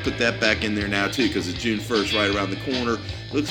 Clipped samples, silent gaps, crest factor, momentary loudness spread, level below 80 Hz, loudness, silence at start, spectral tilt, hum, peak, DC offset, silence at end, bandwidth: under 0.1%; none; 22 dB; 6 LU; -42 dBFS; -23 LUFS; 0 s; -4.5 dB/octave; none; -2 dBFS; under 0.1%; 0 s; 18.5 kHz